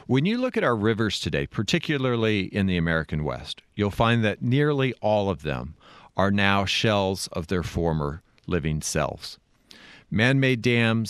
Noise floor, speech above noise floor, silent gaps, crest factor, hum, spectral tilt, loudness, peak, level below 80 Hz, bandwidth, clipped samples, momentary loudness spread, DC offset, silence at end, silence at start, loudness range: -51 dBFS; 27 dB; none; 20 dB; none; -5.5 dB/octave; -24 LUFS; -4 dBFS; -46 dBFS; 13.5 kHz; under 0.1%; 10 LU; under 0.1%; 0 s; 0.1 s; 3 LU